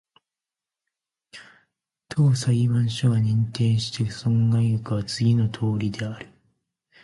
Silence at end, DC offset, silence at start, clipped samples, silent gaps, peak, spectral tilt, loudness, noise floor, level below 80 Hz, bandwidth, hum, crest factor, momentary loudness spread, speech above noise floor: 0.8 s; under 0.1%; 1.35 s; under 0.1%; none; -10 dBFS; -6.5 dB/octave; -23 LUFS; -89 dBFS; -54 dBFS; 11.5 kHz; none; 14 dB; 8 LU; 68 dB